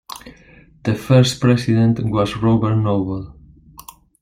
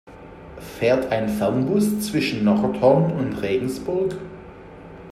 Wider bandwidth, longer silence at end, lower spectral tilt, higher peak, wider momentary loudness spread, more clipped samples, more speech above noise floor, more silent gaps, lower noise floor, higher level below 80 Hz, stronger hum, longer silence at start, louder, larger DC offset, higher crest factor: about the same, 16 kHz vs 15.5 kHz; first, 0.4 s vs 0 s; about the same, -7 dB/octave vs -6.5 dB/octave; about the same, -2 dBFS vs -4 dBFS; second, 16 LU vs 23 LU; neither; first, 31 dB vs 20 dB; neither; first, -47 dBFS vs -41 dBFS; first, -44 dBFS vs -50 dBFS; neither; about the same, 0.1 s vs 0.05 s; first, -17 LUFS vs -21 LUFS; neither; about the same, 16 dB vs 18 dB